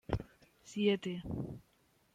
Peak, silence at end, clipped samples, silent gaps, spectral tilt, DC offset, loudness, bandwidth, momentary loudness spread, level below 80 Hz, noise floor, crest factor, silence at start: -16 dBFS; 0.55 s; under 0.1%; none; -6.5 dB/octave; under 0.1%; -37 LUFS; 11 kHz; 18 LU; -54 dBFS; -55 dBFS; 22 dB; 0.1 s